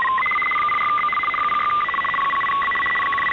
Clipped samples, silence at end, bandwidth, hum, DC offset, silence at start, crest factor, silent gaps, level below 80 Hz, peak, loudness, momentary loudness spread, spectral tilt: under 0.1%; 0 s; 6.8 kHz; none; under 0.1%; 0 s; 10 dB; none; -54 dBFS; -12 dBFS; -19 LUFS; 1 LU; -3.5 dB/octave